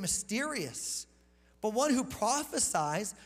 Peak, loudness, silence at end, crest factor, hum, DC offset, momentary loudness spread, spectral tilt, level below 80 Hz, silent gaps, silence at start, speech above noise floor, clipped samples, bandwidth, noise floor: -16 dBFS; -32 LUFS; 0 s; 16 dB; none; under 0.1%; 8 LU; -2.5 dB/octave; -62 dBFS; none; 0 s; 32 dB; under 0.1%; 16 kHz; -64 dBFS